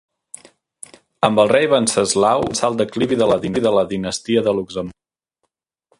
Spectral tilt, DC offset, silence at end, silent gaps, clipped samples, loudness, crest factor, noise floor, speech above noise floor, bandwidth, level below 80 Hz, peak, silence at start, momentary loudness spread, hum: -4 dB/octave; under 0.1%; 1.1 s; none; under 0.1%; -17 LUFS; 18 dB; -74 dBFS; 57 dB; 11.5 kHz; -52 dBFS; 0 dBFS; 1.2 s; 9 LU; none